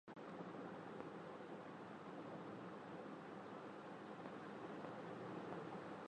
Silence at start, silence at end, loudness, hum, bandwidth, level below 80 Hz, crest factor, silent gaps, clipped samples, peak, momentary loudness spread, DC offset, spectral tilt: 0.05 s; 0 s; -53 LUFS; none; 10 kHz; -88 dBFS; 20 dB; none; under 0.1%; -34 dBFS; 3 LU; under 0.1%; -7 dB/octave